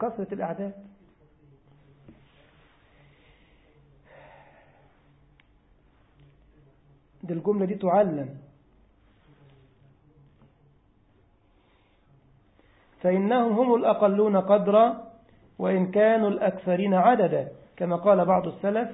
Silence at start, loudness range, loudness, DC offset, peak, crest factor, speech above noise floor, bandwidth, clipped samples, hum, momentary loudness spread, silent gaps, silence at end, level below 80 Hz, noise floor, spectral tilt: 0 s; 14 LU; -24 LUFS; under 0.1%; -6 dBFS; 20 dB; 39 dB; 4 kHz; under 0.1%; none; 13 LU; none; 0 s; -64 dBFS; -62 dBFS; -11.5 dB/octave